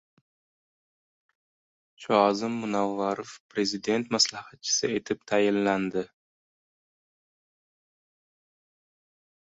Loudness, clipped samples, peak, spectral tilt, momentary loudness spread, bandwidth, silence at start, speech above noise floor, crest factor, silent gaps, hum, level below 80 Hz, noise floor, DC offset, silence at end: -27 LUFS; under 0.1%; -6 dBFS; -3 dB/octave; 12 LU; 8.4 kHz; 2 s; over 63 dB; 24 dB; 3.40-3.49 s; none; -70 dBFS; under -90 dBFS; under 0.1%; 3.45 s